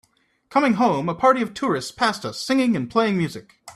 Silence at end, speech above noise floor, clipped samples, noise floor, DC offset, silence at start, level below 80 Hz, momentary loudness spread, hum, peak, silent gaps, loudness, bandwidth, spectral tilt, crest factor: 0.05 s; 34 dB; under 0.1%; -55 dBFS; under 0.1%; 0.5 s; -60 dBFS; 6 LU; none; -4 dBFS; none; -21 LUFS; 14 kHz; -5.5 dB/octave; 18 dB